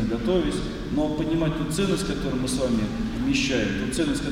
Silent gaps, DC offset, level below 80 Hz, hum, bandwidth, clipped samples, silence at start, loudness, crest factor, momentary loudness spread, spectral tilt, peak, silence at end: none; under 0.1%; -36 dBFS; none; 16 kHz; under 0.1%; 0 s; -25 LUFS; 14 dB; 4 LU; -5 dB/octave; -10 dBFS; 0 s